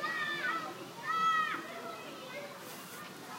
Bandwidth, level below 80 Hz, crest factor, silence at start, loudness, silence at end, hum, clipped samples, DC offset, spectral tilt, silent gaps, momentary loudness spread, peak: 16 kHz; -86 dBFS; 16 dB; 0 s; -36 LUFS; 0 s; none; under 0.1%; under 0.1%; -2.5 dB/octave; none; 15 LU; -22 dBFS